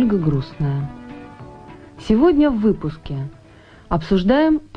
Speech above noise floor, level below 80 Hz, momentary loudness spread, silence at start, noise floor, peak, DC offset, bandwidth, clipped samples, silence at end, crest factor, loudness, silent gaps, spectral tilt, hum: 28 dB; -38 dBFS; 22 LU; 0 s; -45 dBFS; -4 dBFS; under 0.1%; 7.4 kHz; under 0.1%; 0.1 s; 16 dB; -19 LUFS; none; -8.5 dB/octave; none